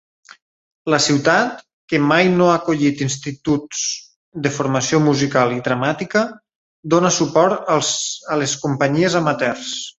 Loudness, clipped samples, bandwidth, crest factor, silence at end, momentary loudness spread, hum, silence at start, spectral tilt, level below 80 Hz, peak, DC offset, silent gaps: -18 LUFS; under 0.1%; 8.4 kHz; 18 dB; 0.1 s; 9 LU; none; 0.85 s; -4 dB/octave; -56 dBFS; 0 dBFS; under 0.1%; 1.73-1.88 s, 4.16-4.32 s, 6.56-6.83 s